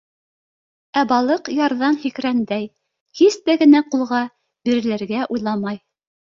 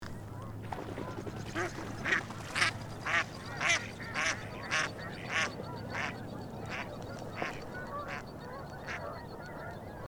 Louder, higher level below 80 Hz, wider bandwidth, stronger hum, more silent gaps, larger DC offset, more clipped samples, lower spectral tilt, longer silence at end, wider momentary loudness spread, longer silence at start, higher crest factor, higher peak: first, -19 LUFS vs -36 LUFS; second, -64 dBFS vs -56 dBFS; second, 7.6 kHz vs over 20 kHz; neither; first, 3.01-3.06 s vs none; neither; neither; first, -5 dB/octave vs -3.5 dB/octave; first, 0.65 s vs 0 s; about the same, 13 LU vs 13 LU; first, 0.95 s vs 0 s; second, 16 dB vs 26 dB; first, -2 dBFS vs -12 dBFS